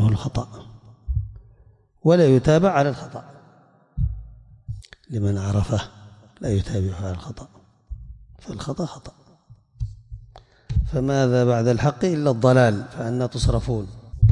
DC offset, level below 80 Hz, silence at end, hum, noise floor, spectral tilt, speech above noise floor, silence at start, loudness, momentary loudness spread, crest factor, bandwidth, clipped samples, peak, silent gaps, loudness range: under 0.1%; -36 dBFS; 0 s; none; -55 dBFS; -7.5 dB/octave; 34 dB; 0 s; -22 LUFS; 24 LU; 18 dB; 10.5 kHz; under 0.1%; -6 dBFS; none; 12 LU